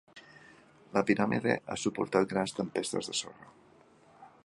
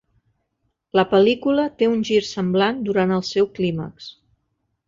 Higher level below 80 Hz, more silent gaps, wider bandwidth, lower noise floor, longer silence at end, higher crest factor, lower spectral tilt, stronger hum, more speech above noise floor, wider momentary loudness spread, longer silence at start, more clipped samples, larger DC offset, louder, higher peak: second, -68 dBFS vs -56 dBFS; neither; first, 11.5 kHz vs 7.6 kHz; second, -60 dBFS vs -73 dBFS; second, 0.2 s vs 0.75 s; first, 24 dB vs 18 dB; second, -4.5 dB/octave vs -6 dB/octave; neither; second, 29 dB vs 54 dB; second, 7 LU vs 11 LU; second, 0.15 s vs 0.95 s; neither; neither; second, -31 LUFS vs -20 LUFS; second, -10 dBFS vs -2 dBFS